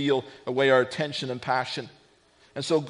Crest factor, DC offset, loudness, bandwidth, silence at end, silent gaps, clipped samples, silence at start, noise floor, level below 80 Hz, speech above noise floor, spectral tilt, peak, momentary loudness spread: 20 dB; under 0.1%; -26 LUFS; 10.5 kHz; 0 s; none; under 0.1%; 0 s; -60 dBFS; -70 dBFS; 34 dB; -5 dB/octave; -8 dBFS; 14 LU